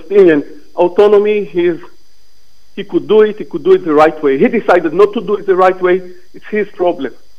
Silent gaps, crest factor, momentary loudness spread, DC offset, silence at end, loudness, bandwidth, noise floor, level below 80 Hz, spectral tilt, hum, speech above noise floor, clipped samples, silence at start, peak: none; 12 dB; 10 LU; 3%; 0.3 s; -12 LUFS; 6.8 kHz; -53 dBFS; -52 dBFS; -7 dB/octave; none; 42 dB; 0.3%; 0.1 s; 0 dBFS